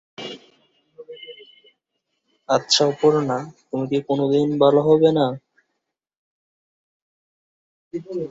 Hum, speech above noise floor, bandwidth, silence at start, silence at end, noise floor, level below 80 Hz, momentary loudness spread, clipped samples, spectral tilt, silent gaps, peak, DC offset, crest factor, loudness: none; 60 dB; 8 kHz; 0.2 s; 0 s; -78 dBFS; -64 dBFS; 22 LU; under 0.1%; -5 dB/octave; 6.17-7.91 s; -2 dBFS; under 0.1%; 20 dB; -19 LUFS